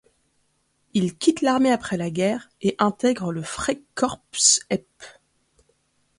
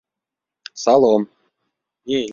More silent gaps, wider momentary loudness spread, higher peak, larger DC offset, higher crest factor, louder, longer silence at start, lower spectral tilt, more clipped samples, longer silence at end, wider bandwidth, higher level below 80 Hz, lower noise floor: neither; second, 10 LU vs 22 LU; about the same, -4 dBFS vs -2 dBFS; neither; about the same, 20 dB vs 18 dB; second, -22 LUFS vs -17 LUFS; first, 0.95 s vs 0.75 s; second, -3.5 dB/octave vs -5 dB/octave; neither; first, 1.1 s vs 0 s; first, 11.5 kHz vs 7.6 kHz; first, -56 dBFS vs -64 dBFS; second, -69 dBFS vs -85 dBFS